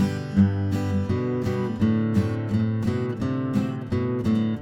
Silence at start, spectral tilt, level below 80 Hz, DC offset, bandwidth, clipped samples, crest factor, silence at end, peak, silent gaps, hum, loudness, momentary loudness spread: 0 s; -8.5 dB/octave; -50 dBFS; under 0.1%; 12 kHz; under 0.1%; 16 dB; 0 s; -8 dBFS; none; none; -24 LUFS; 5 LU